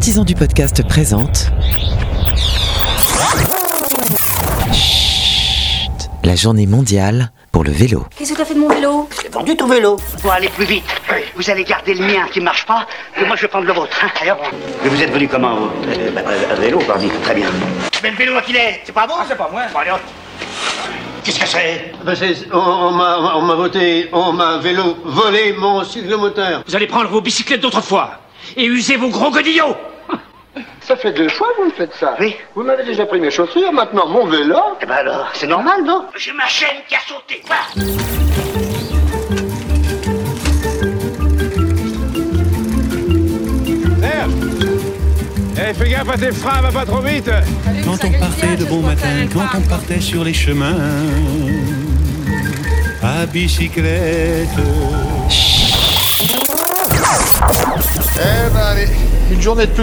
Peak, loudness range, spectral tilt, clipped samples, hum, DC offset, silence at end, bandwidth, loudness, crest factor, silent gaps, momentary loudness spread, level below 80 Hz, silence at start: 0 dBFS; 5 LU; -4.5 dB/octave; under 0.1%; none; under 0.1%; 0 s; over 20 kHz; -14 LUFS; 14 dB; none; 7 LU; -22 dBFS; 0 s